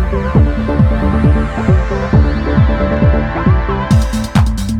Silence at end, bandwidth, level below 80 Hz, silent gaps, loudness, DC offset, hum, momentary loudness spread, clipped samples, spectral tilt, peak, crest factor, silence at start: 0 s; 13 kHz; -16 dBFS; none; -13 LUFS; under 0.1%; none; 2 LU; under 0.1%; -7.5 dB/octave; 0 dBFS; 12 dB; 0 s